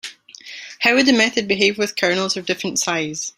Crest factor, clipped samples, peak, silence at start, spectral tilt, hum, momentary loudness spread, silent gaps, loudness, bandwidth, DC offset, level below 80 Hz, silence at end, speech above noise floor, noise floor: 18 dB; under 0.1%; -2 dBFS; 0.05 s; -2.5 dB/octave; none; 20 LU; none; -18 LUFS; 16 kHz; under 0.1%; -62 dBFS; 0.05 s; 21 dB; -39 dBFS